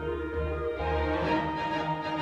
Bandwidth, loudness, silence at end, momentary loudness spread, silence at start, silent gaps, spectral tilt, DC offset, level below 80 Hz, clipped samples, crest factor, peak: 8 kHz; -30 LUFS; 0 s; 4 LU; 0 s; none; -7 dB/octave; under 0.1%; -40 dBFS; under 0.1%; 16 dB; -14 dBFS